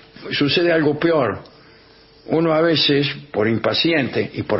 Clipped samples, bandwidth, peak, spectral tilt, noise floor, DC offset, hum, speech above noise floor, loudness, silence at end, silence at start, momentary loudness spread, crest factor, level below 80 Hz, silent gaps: under 0.1%; 5.8 kHz; -6 dBFS; -9 dB/octave; -48 dBFS; under 0.1%; none; 30 dB; -18 LUFS; 0 s; 0.15 s; 8 LU; 14 dB; -56 dBFS; none